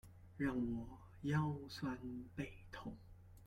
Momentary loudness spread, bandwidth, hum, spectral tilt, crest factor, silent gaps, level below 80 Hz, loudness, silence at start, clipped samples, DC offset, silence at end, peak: 16 LU; 14.5 kHz; none; -7.5 dB/octave; 18 dB; none; -62 dBFS; -44 LUFS; 0.05 s; under 0.1%; under 0.1%; 0 s; -26 dBFS